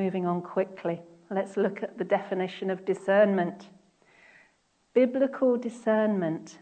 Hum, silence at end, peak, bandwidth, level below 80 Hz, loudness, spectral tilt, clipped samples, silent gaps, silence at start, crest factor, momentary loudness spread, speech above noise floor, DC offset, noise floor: none; 0.05 s; -10 dBFS; 9 kHz; -78 dBFS; -28 LUFS; -7.5 dB/octave; under 0.1%; none; 0 s; 18 dB; 11 LU; 41 dB; under 0.1%; -68 dBFS